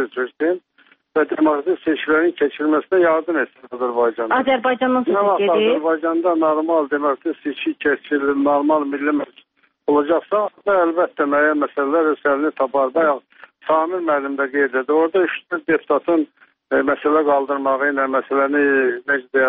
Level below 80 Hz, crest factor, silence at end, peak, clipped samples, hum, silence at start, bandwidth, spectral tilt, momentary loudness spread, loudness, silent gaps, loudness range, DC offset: -64 dBFS; 14 dB; 0 s; -4 dBFS; under 0.1%; none; 0 s; 4.5 kHz; -2.5 dB/octave; 6 LU; -18 LUFS; none; 2 LU; under 0.1%